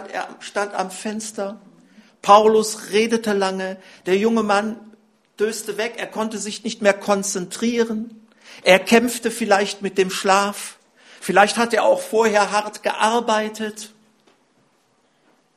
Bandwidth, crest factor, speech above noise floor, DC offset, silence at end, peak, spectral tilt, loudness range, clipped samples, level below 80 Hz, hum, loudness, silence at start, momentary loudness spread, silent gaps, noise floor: 14 kHz; 20 dB; 43 dB; under 0.1%; 1.7 s; 0 dBFS; -3.5 dB/octave; 4 LU; under 0.1%; -68 dBFS; none; -20 LUFS; 0 s; 14 LU; none; -62 dBFS